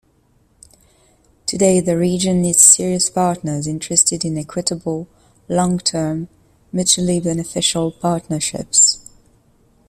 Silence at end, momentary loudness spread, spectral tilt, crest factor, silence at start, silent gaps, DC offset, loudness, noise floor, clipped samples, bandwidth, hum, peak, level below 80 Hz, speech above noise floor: 0.9 s; 14 LU; -3.5 dB/octave; 18 dB; 1.45 s; none; under 0.1%; -16 LUFS; -57 dBFS; under 0.1%; 16 kHz; none; 0 dBFS; -50 dBFS; 41 dB